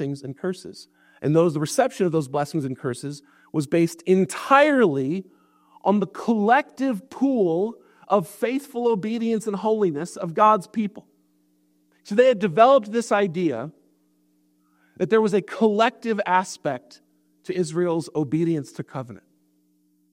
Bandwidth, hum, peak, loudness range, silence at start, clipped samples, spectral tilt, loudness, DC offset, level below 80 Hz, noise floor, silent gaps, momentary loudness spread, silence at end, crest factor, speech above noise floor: 16 kHz; none; -2 dBFS; 4 LU; 0 s; under 0.1%; -6 dB/octave; -22 LUFS; under 0.1%; -72 dBFS; -65 dBFS; none; 13 LU; 0.95 s; 20 dB; 43 dB